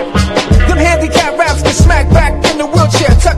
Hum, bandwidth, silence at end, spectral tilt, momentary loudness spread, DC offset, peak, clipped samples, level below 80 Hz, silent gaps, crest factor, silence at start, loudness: none; 13 kHz; 0 s; -5 dB/octave; 3 LU; under 0.1%; 0 dBFS; 1%; -14 dBFS; none; 8 dB; 0 s; -10 LUFS